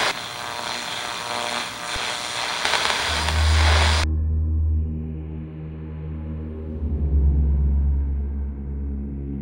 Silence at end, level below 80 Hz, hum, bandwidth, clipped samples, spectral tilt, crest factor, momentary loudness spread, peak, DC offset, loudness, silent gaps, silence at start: 0 s; -26 dBFS; none; 16 kHz; under 0.1%; -4 dB/octave; 22 dB; 13 LU; -2 dBFS; under 0.1%; -24 LUFS; none; 0 s